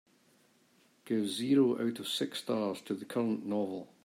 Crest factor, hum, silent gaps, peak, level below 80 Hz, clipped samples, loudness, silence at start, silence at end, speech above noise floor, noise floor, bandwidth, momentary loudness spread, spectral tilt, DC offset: 18 dB; none; none; -16 dBFS; -84 dBFS; under 0.1%; -33 LUFS; 1.05 s; 0.2 s; 35 dB; -68 dBFS; 16 kHz; 9 LU; -5 dB/octave; under 0.1%